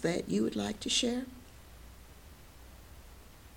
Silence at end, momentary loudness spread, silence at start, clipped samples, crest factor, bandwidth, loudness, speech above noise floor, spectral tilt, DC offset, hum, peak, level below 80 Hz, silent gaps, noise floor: 0 s; 25 LU; 0 s; under 0.1%; 20 dB; 18 kHz; -32 LUFS; 21 dB; -3.5 dB/octave; under 0.1%; none; -18 dBFS; -56 dBFS; none; -53 dBFS